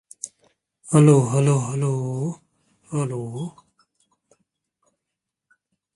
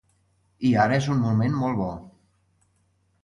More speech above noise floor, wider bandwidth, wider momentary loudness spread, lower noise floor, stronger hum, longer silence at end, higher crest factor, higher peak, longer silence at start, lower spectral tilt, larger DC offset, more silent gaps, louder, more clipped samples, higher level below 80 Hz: first, 64 dB vs 45 dB; about the same, 11.5 kHz vs 11 kHz; first, 21 LU vs 10 LU; first, -84 dBFS vs -67 dBFS; neither; first, 2.45 s vs 1.15 s; about the same, 22 dB vs 20 dB; first, -2 dBFS vs -6 dBFS; second, 0.25 s vs 0.6 s; about the same, -7.5 dB/octave vs -7.5 dB/octave; neither; neither; about the same, -21 LUFS vs -23 LUFS; neither; second, -62 dBFS vs -54 dBFS